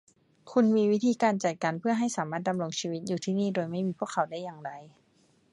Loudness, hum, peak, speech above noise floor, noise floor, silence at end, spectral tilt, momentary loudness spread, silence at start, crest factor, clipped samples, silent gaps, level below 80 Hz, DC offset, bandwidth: -29 LUFS; none; -12 dBFS; 38 dB; -66 dBFS; 0.65 s; -5.5 dB/octave; 11 LU; 0.45 s; 18 dB; under 0.1%; none; -76 dBFS; under 0.1%; 11.5 kHz